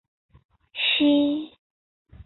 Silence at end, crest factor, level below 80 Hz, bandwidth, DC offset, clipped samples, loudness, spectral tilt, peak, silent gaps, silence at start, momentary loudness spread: 0.05 s; 16 dB; -58 dBFS; 4.3 kHz; under 0.1%; under 0.1%; -22 LUFS; -8 dB/octave; -10 dBFS; 1.59-2.05 s; 0.75 s; 19 LU